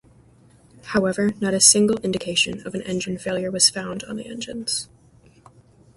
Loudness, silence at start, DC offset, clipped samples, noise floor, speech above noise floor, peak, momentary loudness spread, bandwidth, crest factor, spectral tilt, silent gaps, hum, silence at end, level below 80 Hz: -20 LUFS; 0.85 s; under 0.1%; under 0.1%; -53 dBFS; 31 dB; 0 dBFS; 17 LU; 12 kHz; 24 dB; -2.5 dB/octave; none; none; 1.1 s; -56 dBFS